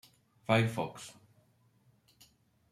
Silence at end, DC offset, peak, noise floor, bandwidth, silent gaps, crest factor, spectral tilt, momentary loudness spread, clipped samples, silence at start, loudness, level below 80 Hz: 1.6 s; under 0.1%; -12 dBFS; -69 dBFS; 14.5 kHz; none; 26 dB; -6 dB/octave; 20 LU; under 0.1%; 0.5 s; -32 LUFS; -72 dBFS